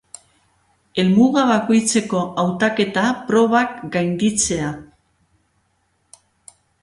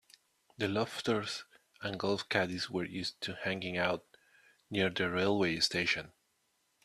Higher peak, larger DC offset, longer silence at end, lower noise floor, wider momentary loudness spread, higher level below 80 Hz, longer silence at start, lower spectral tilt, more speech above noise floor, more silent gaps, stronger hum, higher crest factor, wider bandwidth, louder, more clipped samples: first, -4 dBFS vs -12 dBFS; neither; first, 2 s vs 0.75 s; second, -66 dBFS vs -77 dBFS; about the same, 8 LU vs 10 LU; first, -52 dBFS vs -70 dBFS; first, 0.95 s vs 0.6 s; about the same, -4.5 dB/octave vs -4 dB/octave; first, 48 dB vs 43 dB; neither; neither; second, 16 dB vs 24 dB; second, 11.5 kHz vs 13.5 kHz; first, -18 LUFS vs -34 LUFS; neither